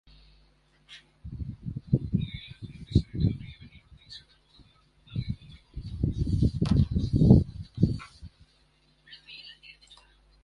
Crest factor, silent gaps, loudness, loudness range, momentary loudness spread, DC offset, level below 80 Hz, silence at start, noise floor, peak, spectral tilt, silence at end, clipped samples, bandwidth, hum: 24 dB; none; -28 LUFS; 8 LU; 25 LU; under 0.1%; -38 dBFS; 0.9 s; -65 dBFS; -6 dBFS; -9 dB/octave; 0.9 s; under 0.1%; 10.5 kHz; none